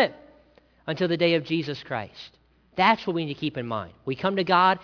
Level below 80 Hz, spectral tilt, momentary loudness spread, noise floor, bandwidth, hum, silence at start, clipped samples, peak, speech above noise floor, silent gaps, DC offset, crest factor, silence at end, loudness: -62 dBFS; -6.5 dB/octave; 17 LU; -58 dBFS; 5.4 kHz; none; 0 s; under 0.1%; -6 dBFS; 34 dB; none; under 0.1%; 20 dB; 0 s; -25 LUFS